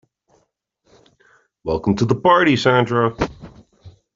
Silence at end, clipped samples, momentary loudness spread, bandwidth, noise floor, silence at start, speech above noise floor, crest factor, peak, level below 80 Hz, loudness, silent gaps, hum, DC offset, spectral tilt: 0.25 s; under 0.1%; 12 LU; 7.6 kHz; -67 dBFS; 1.65 s; 51 dB; 18 dB; -2 dBFS; -46 dBFS; -17 LUFS; none; none; under 0.1%; -6.5 dB/octave